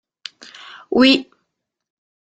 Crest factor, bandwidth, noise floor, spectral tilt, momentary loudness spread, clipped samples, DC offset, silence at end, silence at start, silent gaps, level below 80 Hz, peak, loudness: 20 dB; 9 kHz; -75 dBFS; -3.5 dB/octave; 25 LU; under 0.1%; under 0.1%; 1.1 s; 0.9 s; none; -60 dBFS; -2 dBFS; -15 LUFS